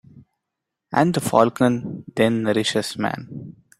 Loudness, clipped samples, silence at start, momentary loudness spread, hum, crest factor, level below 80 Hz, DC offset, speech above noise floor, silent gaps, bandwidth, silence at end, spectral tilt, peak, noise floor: -21 LUFS; under 0.1%; 0.15 s; 13 LU; none; 22 dB; -60 dBFS; under 0.1%; 63 dB; none; 16 kHz; 0.3 s; -5.5 dB/octave; 0 dBFS; -82 dBFS